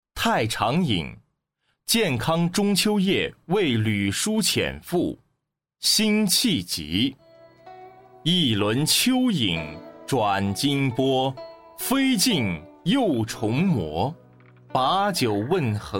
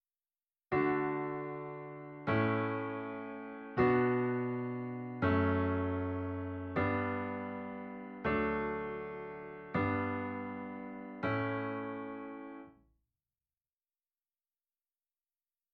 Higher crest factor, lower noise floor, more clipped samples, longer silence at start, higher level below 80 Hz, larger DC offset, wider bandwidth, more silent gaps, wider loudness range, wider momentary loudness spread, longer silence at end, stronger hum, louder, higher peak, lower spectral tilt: about the same, 16 dB vs 20 dB; second, -78 dBFS vs under -90 dBFS; neither; second, 0.15 s vs 0.7 s; first, -52 dBFS vs -62 dBFS; neither; first, 17 kHz vs 5.6 kHz; neither; second, 2 LU vs 8 LU; second, 9 LU vs 14 LU; second, 0 s vs 3 s; neither; first, -23 LUFS vs -36 LUFS; first, -8 dBFS vs -16 dBFS; second, -4 dB/octave vs -6.5 dB/octave